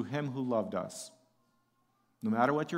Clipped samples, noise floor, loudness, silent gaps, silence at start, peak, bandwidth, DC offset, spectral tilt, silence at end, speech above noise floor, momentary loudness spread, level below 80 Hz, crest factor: under 0.1%; -74 dBFS; -33 LUFS; none; 0 s; -14 dBFS; 16 kHz; under 0.1%; -6 dB/octave; 0 s; 42 dB; 15 LU; -80 dBFS; 20 dB